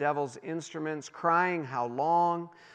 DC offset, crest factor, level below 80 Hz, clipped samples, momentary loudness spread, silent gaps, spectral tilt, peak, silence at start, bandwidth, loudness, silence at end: under 0.1%; 18 dB; -88 dBFS; under 0.1%; 10 LU; none; -5.5 dB/octave; -12 dBFS; 0 s; 9.4 kHz; -30 LUFS; 0.1 s